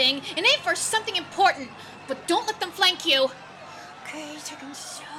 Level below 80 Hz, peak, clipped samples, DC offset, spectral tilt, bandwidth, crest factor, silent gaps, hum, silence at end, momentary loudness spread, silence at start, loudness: -70 dBFS; -8 dBFS; under 0.1%; under 0.1%; -1 dB/octave; 19.5 kHz; 18 dB; none; none; 0 s; 20 LU; 0 s; -22 LUFS